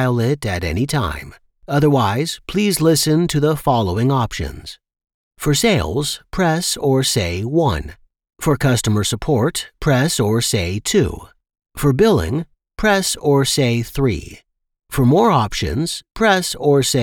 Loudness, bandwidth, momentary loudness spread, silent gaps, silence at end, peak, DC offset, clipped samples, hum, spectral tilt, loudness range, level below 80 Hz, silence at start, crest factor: -17 LUFS; 19 kHz; 9 LU; 5.14-5.31 s; 0 s; -2 dBFS; under 0.1%; under 0.1%; none; -5 dB/octave; 2 LU; -36 dBFS; 0 s; 14 dB